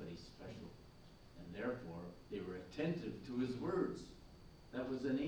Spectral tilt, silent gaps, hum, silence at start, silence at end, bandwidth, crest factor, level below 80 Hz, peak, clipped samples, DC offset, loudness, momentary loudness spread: -7 dB/octave; none; none; 0 s; 0 s; over 20 kHz; 18 dB; -64 dBFS; -26 dBFS; under 0.1%; under 0.1%; -45 LUFS; 21 LU